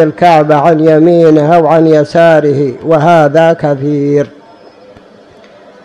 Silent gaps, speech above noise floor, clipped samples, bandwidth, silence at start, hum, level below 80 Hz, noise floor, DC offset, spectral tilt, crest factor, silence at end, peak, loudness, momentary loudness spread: none; 31 dB; 3%; 10.5 kHz; 0 s; none; -50 dBFS; -38 dBFS; under 0.1%; -8 dB/octave; 8 dB; 1.55 s; 0 dBFS; -7 LUFS; 6 LU